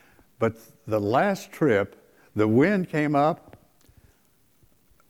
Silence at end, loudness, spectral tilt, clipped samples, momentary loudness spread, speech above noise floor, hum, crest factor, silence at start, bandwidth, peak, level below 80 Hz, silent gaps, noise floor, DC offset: 1.75 s; -24 LUFS; -7.5 dB/octave; under 0.1%; 13 LU; 41 dB; none; 18 dB; 0.4 s; 18.5 kHz; -8 dBFS; -64 dBFS; none; -64 dBFS; under 0.1%